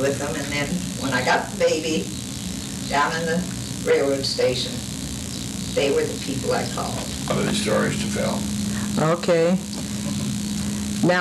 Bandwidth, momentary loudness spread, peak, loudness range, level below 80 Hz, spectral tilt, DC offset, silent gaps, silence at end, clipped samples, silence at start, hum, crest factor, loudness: 14.5 kHz; 9 LU; -8 dBFS; 1 LU; -44 dBFS; -4.5 dB/octave; under 0.1%; none; 0 s; under 0.1%; 0 s; none; 14 dB; -23 LUFS